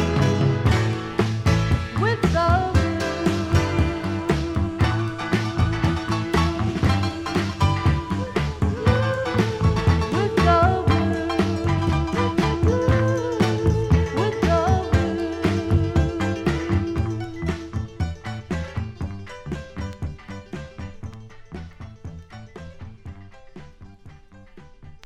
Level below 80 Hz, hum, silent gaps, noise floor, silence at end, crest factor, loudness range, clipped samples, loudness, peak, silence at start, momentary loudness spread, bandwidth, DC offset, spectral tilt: -32 dBFS; none; none; -45 dBFS; 0.1 s; 18 dB; 16 LU; under 0.1%; -22 LUFS; -4 dBFS; 0 s; 17 LU; 12 kHz; under 0.1%; -7 dB/octave